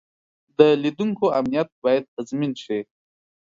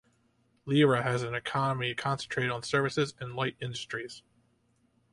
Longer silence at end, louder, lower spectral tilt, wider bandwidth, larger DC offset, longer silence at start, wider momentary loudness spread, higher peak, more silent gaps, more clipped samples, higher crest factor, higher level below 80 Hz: second, 0.6 s vs 0.95 s; first, -22 LUFS vs -30 LUFS; first, -7 dB/octave vs -5.5 dB/octave; second, 7.6 kHz vs 11.5 kHz; neither; about the same, 0.6 s vs 0.65 s; about the same, 13 LU vs 13 LU; first, -2 dBFS vs -12 dBFS; first, 1.72-1.82 s, 2.08-2.17 s vs none; neither; about the same, 22 dB vs 20 dB; about the same, -66 dBFS vs -66 dBFS